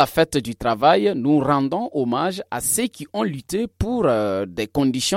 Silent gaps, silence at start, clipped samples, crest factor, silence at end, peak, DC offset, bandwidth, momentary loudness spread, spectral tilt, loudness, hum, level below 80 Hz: none; 0 s; under 0.1%; 20 dB; 0 s; -2 dBFS; under 0.1%; 16.5 kHz; 8 LU; -4.5 dB/octave; -21 LUFS; none; -44 dBFS